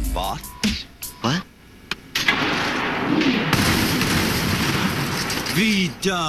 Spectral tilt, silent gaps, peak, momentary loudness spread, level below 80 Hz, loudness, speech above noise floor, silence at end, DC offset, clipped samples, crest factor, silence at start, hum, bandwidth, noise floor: -4 dB/octave; none; -4 dBFS; 8 LU; -36 dBFS; -21 LUFS; 22 dB; 0 s; under 0.1%; under 0.1%; 18 dB; 0 s; none; 15 kHz; -44 dBFS